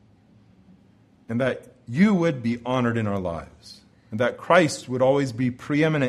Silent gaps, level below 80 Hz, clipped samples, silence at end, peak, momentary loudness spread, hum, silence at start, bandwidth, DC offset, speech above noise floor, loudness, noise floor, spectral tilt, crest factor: none; -56 dBFS; under 0.1%; 0 s; -4 dBFS; 13 LU; none; 1.3 s; 12.5 kHz; under 0.1%; 34 dB; -23 LUFS; -56 dBFS; -6.5 dB/octave; 20 dB